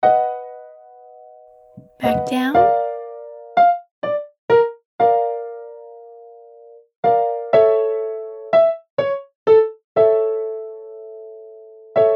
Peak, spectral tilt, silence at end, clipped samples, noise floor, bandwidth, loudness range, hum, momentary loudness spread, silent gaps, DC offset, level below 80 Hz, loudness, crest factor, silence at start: -2 dBFS; -6.5 dB/octave; 0 s; under 0.1%; -46 dBFS; 12.5 kHz; 4 LU; none; 21 LU; 3.91-4.02 s, 4.38-4.48 s, 4.85-4.99 s, 6.96-7.03 s, 8.90-8.97 s, 9.35-9.46 s, 9.84-9.95 s; under 0.1%; -58 dBFS; -18 LUFS; 16 dB; 0 s